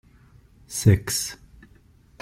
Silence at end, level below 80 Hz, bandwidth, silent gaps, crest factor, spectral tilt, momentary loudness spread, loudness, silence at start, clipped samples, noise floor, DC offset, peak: 0.85 s; -48 dBFS; 16 kHz; none; 22 dB; -5 dB/octave; 14 LU; -23 LUFS; 0.7 s; under 0.1%; -55 dBFS; under 0.1%; -4 dBFS